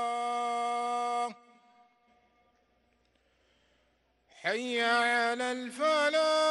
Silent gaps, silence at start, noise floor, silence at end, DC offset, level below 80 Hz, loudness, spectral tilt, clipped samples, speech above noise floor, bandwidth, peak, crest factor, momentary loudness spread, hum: none; 0 s; -72 dBFS; 0 s; under 0.1%; -82 dBFS; -30 LUFS; -1.5 dB/octave; under 0.1%; 43 dB; 12 kHz; -16 dBFS; 16 dB; 8 LU; none